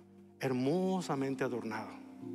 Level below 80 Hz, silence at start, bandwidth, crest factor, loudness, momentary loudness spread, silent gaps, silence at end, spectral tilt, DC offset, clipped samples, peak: -84 dBFS; 0 s; 14 kHz; 14 dB; -35 LUFS; 11 LU; none; 0 s; -6.5 dB/octave; under 0.1%; under 0.1%; -22 dBFS